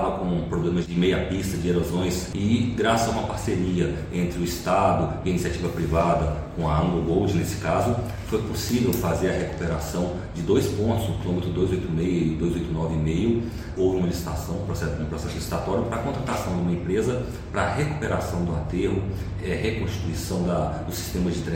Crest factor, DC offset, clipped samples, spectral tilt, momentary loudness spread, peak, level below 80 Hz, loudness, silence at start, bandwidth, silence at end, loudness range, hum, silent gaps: 18 dB; under 0.1%; under 0.1%; -6.5 dB/octave; 6 LU; -8 dBFS; -36 dBFS; -25 LUFS; 0 s; 16.5 kHz; 0 s; 3 LU; none; none